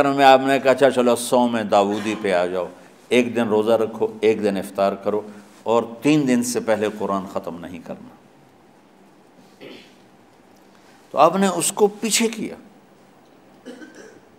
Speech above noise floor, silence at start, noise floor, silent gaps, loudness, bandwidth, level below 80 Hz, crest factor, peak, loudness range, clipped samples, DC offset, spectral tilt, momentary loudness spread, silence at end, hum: 33 dB; 0 s; -51 dBFS; none; -19 LUFS; 16 kHz; -70 dBFS; 20 dB; 0 dBFS; 9 LU; under 0.1%; under 0.1%; -4 dB/octave; 18 LU; 0.3 s; none